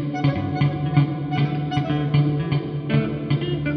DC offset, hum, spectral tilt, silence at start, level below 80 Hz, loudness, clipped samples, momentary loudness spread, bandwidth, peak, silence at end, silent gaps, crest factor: under 0.1%; none; -9 dB/octave; 0 s; -46 dBFS; -22 LUFS; under 0.1%; 4 LU; 6.2 kHz; -6 dBFS; 0 s; none; 16 dB